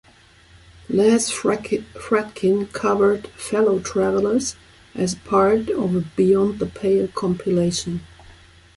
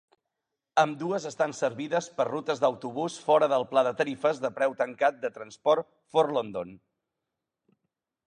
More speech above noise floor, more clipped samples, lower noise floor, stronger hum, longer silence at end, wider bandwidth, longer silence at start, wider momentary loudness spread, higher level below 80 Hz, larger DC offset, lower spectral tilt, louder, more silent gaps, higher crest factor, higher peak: second, 31 dB vs 59 dB; neither; second, -51 dBFS vs -86 dBFS; neither; second, 0.45 s vs 1.5 s; first, 11.5 kHz vs 10 kHz; first, 0.9 s vs 0.75 s; about the same, 9 LU vs 8 LU; first, -50 dBFS vs -76 dBFS; neither; about the same, -5.5 dB/octave vs -4.5 dB/octave; first, -20 LUFS vs -28 LUFS; neither; about the same, 16 dB vs 20 dB; first, -4 dBFS vs -8 dBFS